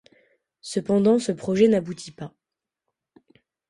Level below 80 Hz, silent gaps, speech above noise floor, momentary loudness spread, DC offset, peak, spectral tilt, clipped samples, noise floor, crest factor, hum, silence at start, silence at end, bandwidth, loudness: -64 dBFS; none; 65 dB; 21 LU; under 0.1%; -6 dBFS; -6.5 dB/octave; under 0.1%; -87 dBFS; 20 dB; none; 0.65 s; 1.4 s; 11.5 kHz; -22 LUFS